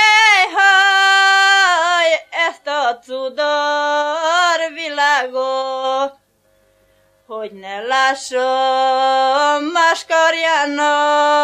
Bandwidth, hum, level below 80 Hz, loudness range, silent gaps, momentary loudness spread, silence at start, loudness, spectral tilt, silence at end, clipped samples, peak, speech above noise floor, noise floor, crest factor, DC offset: 13.5 kHz; none; -68 dBFS; 8 LU; none; 11 LU; 0 s; -14 LUFS; 0.5 dB/octave; 0 s; under 0.1%; 0 dBFS; 43 dB; -58 dBFS; 14 dB; under 0.1%